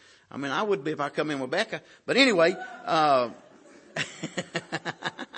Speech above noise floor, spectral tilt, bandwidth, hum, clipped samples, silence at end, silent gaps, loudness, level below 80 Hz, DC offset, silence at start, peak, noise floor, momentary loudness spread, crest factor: 26 dB; -4 dB/octave; 8.8 kHz; none; under 0.1%; 0 s; none; -27 LUFS; -76 dBFS; under 0.1%; 0.35 s; -6 dBFS; -52 dBFS; 15 LU; 22 dB